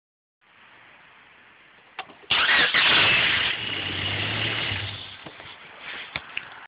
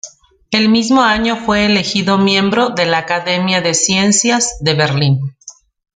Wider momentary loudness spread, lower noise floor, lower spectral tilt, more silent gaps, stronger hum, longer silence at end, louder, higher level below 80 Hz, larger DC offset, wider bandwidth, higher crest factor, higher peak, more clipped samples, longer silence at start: first, 23 LU vs 5 LU; first, -53 dBFS vs -40 dBFS; first, -7 dB/octave vs -3.5 dB/octave; neither; neither; second, 0 s vs 0.45 s; second, -21 LUFS vs -13 LUFS; second, -56 dBFS vs -44 dBFS; neither; second, 5.4 kHz vs 9.6 kHz; about the same, 18 dB vs 14 dB; second, -8 dBFS vs 0 dBFS; neither; first, 2 s vs 0.05 s